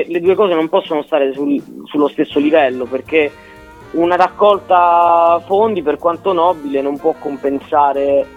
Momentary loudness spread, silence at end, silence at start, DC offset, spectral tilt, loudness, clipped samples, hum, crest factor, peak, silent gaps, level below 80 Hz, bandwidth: 8 LU; 0.1 s; 0 s; under 0.1%; -6.5 dB/octave; -14 LUFS; under 0.1%; none; 14 dB; 0 dBFS; none; -52 dBFS; 12.5 kHz